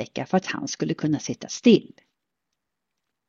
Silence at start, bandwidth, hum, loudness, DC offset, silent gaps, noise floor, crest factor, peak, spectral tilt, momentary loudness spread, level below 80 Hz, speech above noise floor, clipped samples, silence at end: 0 s; 7.6 kHz; none; -23 LUFS; under 0.1%; none; -83 dBFS; 20 dB; -6 dBFS; -5 dB/octave; 10 LU; -66 dBFS; 59 dB; under 0.1%; 1.45 s